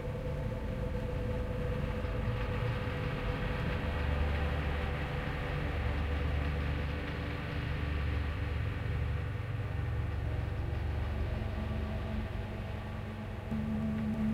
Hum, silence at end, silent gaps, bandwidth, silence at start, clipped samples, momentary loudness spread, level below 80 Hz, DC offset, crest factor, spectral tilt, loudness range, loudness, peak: none; 0 s; none; 10.5 kHz; 0 s; under 0.1%; 4 LU; -38 dBFS; under 0.1%; 14 dB; -7.5 dB/octave; 2 LU; -36 LUFS; -22 dBFS